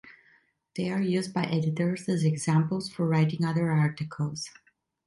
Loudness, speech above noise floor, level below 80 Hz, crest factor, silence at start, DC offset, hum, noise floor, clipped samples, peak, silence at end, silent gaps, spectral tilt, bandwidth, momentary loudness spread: -28 LUFS; 38 dB; -66 dBFS; 16 dB; 0.05 s; under 0.1%; none; -65 dBFS; under 0.1%; -12 dBFS; 0.55 s; none; -6.5 dB/octave; 11.5 kHz; 8 LU